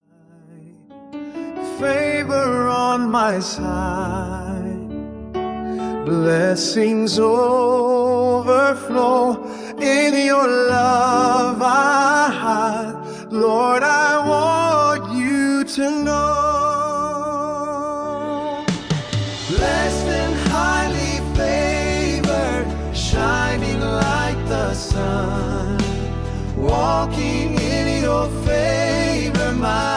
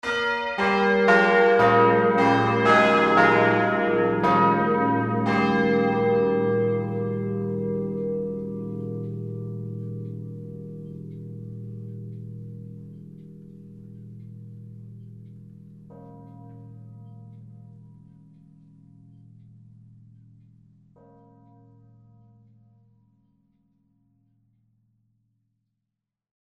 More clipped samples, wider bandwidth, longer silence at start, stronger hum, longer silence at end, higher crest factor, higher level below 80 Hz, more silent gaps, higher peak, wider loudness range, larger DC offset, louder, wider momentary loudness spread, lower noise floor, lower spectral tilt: neither; first, 10.5 kHz vs 9 kHz; first, 0.5 s vs 0.05 s; neither; second, 0 s vs 8.65 s; second, 16 dB vs 22 dB; first, -32 dBFS vs -60 dBFS; neither; about the same, -2 dBFS vs -4 dBFS; second, 5 LU vs 26 LU; neither; about the same, -19 LUFS vs -21 LUFS; second, 10 LU vs 27 LU; second, -49 dBFS vs -85 dBFS; second, -5 dB/octave vs -7 dB/octave